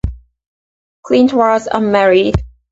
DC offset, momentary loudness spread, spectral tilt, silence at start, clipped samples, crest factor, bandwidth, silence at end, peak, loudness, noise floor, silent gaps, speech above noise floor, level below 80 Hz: under 0.1%; 8 LU; -6.5 dB/octave; 0.05 s; under 0.1%; 14 dB; 8 kHz; 0.25 s; 0 dBFS; -13 LUFS; under -90 dBFS; 0.47-1.03 s; over 79 dB; -30 dBFS